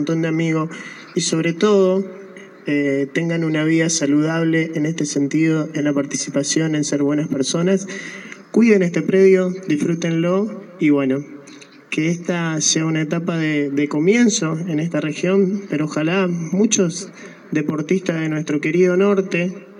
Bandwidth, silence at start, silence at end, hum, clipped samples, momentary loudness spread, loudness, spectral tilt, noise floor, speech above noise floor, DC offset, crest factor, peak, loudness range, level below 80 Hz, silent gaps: 11 kHz; 0 s; 0 s; none; under 0.1%; 10 LU; -18 LUFS; -5 dB/octave; -42 dBFS; 24 dB; under 0.1%; 16 dB; -2 dBFS; 3 LU; -78 dBFS; none